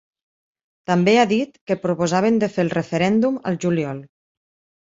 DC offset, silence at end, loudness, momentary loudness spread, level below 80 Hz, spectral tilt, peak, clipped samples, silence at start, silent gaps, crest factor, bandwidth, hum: under 0.1%; 0.8 s; -20 LUFS; 9 LU; -60 dBFS; -6 dB/octave; -4 dBFS; under 0.1%; 0.9 s; 1.61-1.67 s; 18 dB; 7.8 kHz; none